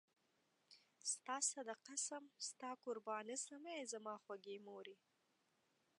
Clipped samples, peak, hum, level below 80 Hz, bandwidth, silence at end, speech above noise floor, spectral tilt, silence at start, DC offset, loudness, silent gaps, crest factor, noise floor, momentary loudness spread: under 0.1%; -28 dBFS; none; under -90 dBFS; 11.5 kHz; 1.05 s; 34 dB; -0.5 dB/octave; 0.7 s; under 0.1%; -48 LUFS; none; 22 dB; -83 dBFS; 12 LU